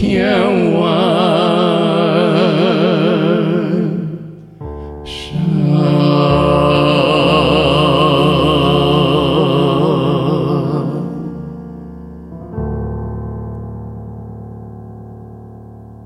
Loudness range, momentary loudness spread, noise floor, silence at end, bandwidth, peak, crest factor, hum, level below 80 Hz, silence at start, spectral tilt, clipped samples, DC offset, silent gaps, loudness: 15 LU; 20 LU; -34 dBFS; 0 s; 12.5 kHz; 0 dBFS; 14 dB; none; -34 dBFS; 0 s; -7.5 dB/octave; under 0.1%; under 0.1%; none; -13 LUFS